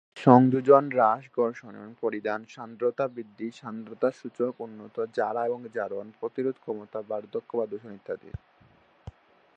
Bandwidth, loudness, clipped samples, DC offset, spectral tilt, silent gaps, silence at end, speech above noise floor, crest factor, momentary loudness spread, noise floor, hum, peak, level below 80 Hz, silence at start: 7.8 kHz; -27 LUFS; under 0.1%; under 0.1%; -8.5 dB/octave; none; 0.45 s; 33 dB; 26 dB; 20 LU; -60 dBFS; none; -2 dBFS; -60 dBFS; 0.15 s